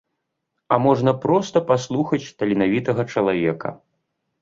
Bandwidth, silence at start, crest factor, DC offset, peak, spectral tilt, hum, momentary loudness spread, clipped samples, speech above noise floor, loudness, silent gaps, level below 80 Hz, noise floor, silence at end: 7.8 kHz; 0.7 s; 20 dB; under 0.1%; -2 dBFS; -7 dB/octave; none; 6 LU; under 0.1%; 57 dB; -20 LUFS; none; -58 dBFS; -77 dBFS; 0.65 s